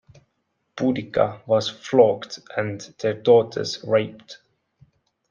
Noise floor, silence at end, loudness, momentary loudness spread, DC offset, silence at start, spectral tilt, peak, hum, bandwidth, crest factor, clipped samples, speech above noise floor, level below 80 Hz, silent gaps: -73 dBFS; 0.95 s; -22 LUFS; 13 LU; under 0.1%; 0.75 s; -5.5 dB/octave; -2 dBFS; none; 7.4 kHz; 20 dB; under 0.1%; 52 dB; -64 dBFS; none